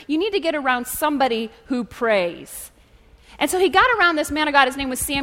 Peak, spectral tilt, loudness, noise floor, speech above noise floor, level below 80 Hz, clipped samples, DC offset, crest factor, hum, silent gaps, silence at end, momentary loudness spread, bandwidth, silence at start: 0 dBFS; -2.5 dB/octave; -20 LUFS; -51 dBFS; 31 dB; -48 dBFS; under 0.1%; under 0.1%; 20 dB; none; none; 0 s; 11 LU; 16.5 kHz; 0 s